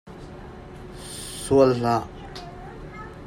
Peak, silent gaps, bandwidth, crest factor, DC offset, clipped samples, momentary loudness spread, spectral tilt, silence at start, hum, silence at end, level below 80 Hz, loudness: -4 dBFS; none; 16 kHz; 22 dB; under 0.1%; under 0.1%; 23 LU; -6 dB/octave; 0.05 s; none; 0 s; -46 dBFS; -22 LUFS